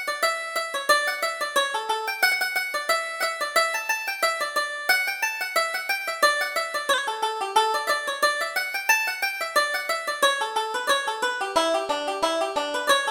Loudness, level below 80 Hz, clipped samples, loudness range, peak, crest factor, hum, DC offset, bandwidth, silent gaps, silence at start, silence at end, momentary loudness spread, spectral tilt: -23 LUFS; -66 dBFS; under 0.1%; 1 LU; -6 dBFS; 20 dB; none; under 0.1%; over 20 kHz; none; 0 s; 0 s; 5 LU; 1 dB/octave